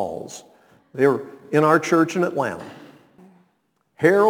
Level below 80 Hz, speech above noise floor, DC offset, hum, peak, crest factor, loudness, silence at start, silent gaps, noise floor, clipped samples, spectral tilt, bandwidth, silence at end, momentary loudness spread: -68 dBFS; 49 dB; under 0.1%; none; -2 dBFS; 20 dB; -20 LUFS; 0 s; none; -68 dBFS; under 0.1%; -6 dB/octave; 19 kHz; 0 s; 20 LU